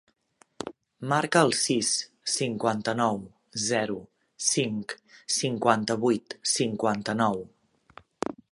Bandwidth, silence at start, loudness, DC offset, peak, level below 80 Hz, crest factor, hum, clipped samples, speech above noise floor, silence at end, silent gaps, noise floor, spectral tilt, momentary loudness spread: 11.5 kHz; 0.6 s; -27 LUFS; under 0.1%; -4 dBFS; -68 dBFS; 24 dB; none; under 0.1%; 28 dB; 0.2 s; none; -55 dBFS; -3.5 dB/octave; 15 LU